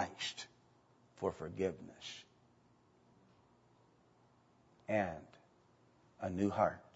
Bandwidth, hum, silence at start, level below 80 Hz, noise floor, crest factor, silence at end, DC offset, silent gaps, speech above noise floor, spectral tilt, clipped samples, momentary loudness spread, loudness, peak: 7.6 kHz; 60 Hz at -75 dBFS; 0 s; -72 dBFS; -70 dBFS; 26 dB; 0.15 s; under 0.1%; none; 31 dB; -4 dB/octave; under 0.1%; 17 LU; -40 LUFS; -18 dBFS